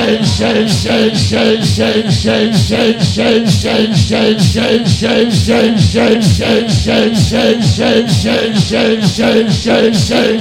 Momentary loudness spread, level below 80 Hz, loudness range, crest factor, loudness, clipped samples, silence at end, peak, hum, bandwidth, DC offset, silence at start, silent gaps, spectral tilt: 2 LU; -32 dBFS; 1 LU; 10 dB; -11 LUFS; 0.4%; 0 s; 0 dBFS; none; 15.5 kHz; under 0.1%; 0 s; none; -5.5 dB/octave